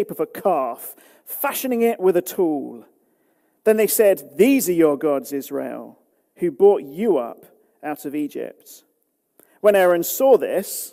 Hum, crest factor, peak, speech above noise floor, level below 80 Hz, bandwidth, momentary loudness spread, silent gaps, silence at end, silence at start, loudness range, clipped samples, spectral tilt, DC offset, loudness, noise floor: none; 18 dB; -4 dBFS; 50 dB; -72 dBFS; 16 kHz; 16 LU; none; 0.05 s; 0 s; 4 LU; under 0.1%; -4.5 dB/octave; under 0.1%; -19 LUFS; -69 dBFS